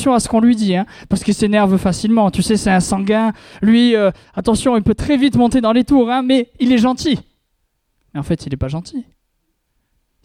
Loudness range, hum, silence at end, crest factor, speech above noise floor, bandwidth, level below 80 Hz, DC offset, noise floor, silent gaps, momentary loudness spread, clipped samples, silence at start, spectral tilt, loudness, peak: 6 LU; none; 1.2 s; 14 dB; 53 dB; 13.5 kHz; -38 dBFS; under 0.1%; -67 dBFS; none; 9 LU; under 0.1%; 0 s; -5.5 dB/octave; -15 LUFS; -2 dBFS